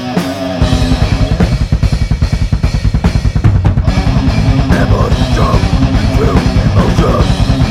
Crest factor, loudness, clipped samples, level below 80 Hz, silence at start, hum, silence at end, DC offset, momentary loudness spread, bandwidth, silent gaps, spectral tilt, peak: 10 dB; -12 LUFS; 0.3%; -14 dBFS; 0 s; none; 0 s; under 0.1%; 3 LU; 13 kHz; none; -7 dB/octave; 0 dBFS